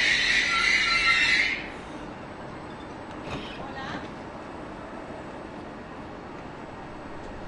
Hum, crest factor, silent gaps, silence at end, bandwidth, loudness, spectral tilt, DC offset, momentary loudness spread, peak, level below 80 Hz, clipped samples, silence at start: none; 20 dB; none; 0 s; 11.5 kHz; -23 LUFS; -2 dB/octave; under 0.1%; 20 LU; -10 dBFS; -50 dBFS; under 0.1%; 0 s